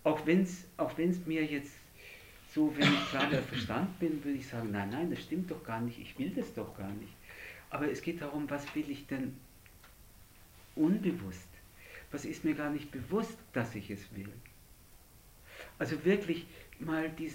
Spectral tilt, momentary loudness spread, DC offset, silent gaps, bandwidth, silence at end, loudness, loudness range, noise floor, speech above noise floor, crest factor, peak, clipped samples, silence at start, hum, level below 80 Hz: -6 dB/octave; 20 LU; under 0.1%; none; 16.5 kHz; 0 s; -35 LUFS; 7 LU; -58 dBFS; 24 dB; 22 dB; -14 dBFS; under 0.1%; 0 s; none; -60 dBFS